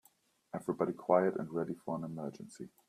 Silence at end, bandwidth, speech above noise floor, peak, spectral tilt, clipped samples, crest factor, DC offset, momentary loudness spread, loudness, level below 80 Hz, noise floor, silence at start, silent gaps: 0.2 s; 15 kHz; 35 dB; -14 dBFS; -8 dB/octave; under 0.1%; 22 dB; under 0.1%; 16 LU; -35 LUFS; -78 dBFS; -71 dBFS; 0.55 s; none